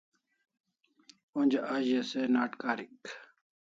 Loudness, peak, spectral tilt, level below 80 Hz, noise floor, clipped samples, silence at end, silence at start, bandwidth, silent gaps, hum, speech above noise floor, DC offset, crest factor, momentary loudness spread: -31 LUFS; -14 dBFS; -5 dB/octave; -84 dBFS; -63 dBFS; under 0.1%; 0.45 s; 1.35 s; 7.6 kHz; none; none; 32 dB; under 0.1%; 20 dB; 17 LU